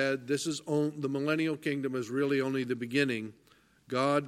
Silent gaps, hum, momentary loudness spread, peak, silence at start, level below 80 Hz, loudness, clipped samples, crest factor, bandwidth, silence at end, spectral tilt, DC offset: none; none; 4 LU; -14 dBFS; 0 s; -76 dBFS; -31 LUFS; under 0.1%; 16 dB; 15 kHz; 0 s; -5.5 dB/octave; under 0.1%